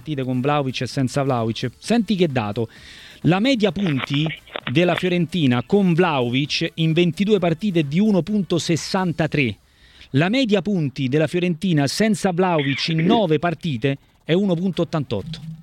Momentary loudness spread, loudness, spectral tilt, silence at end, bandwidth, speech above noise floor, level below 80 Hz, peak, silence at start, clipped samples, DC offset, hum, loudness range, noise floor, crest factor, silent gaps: 7 LU; -20 LUFS; -6 dB/octave; 0 s; 14 kHz; 29 dB; -52 dBFS; -4 dBFS; 0.05 s; under 0.1%; under 0.1%; none; 2 LU; -49 dBFS; 16 dB; none